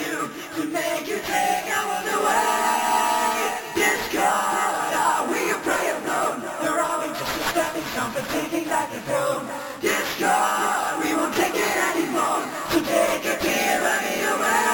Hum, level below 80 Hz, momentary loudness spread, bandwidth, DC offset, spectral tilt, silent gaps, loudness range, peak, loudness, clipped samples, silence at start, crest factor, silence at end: none; -56 dBFS; 6 LU; 19.5 kHz; under 0.1%; -2.5 dB/octave; none; 3 LU; -8 dBFS; -23 LUFS; under 0.1%; 0 s; 16 dB; 0 s